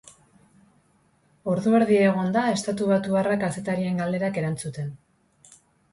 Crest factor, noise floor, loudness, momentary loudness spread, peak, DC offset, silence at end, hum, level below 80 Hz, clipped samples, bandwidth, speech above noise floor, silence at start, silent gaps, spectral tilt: 16 dB; -63 dBFS; -24 LUFS; 12 LU; -10 dBFS; under 0.1%; 0.95 s; none; -62 dBFS; under 0.1%; 11.5 kHz; 40 dB; 0.05 s; none; -6.5 dB/octave